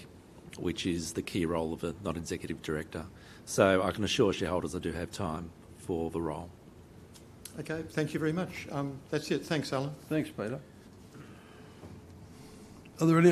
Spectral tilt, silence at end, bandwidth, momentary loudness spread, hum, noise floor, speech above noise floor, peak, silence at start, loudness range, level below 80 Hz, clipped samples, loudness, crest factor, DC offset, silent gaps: -5.5 dB/octave; 0 s; 14.5 kHz; 24 LU; none; -53 dBFS; 21 dB; -8 dBFS; 0 s; 7 LU; -60 dBFS; under 0.1%; -33 LUFS; 24 dB; under 0.1%; none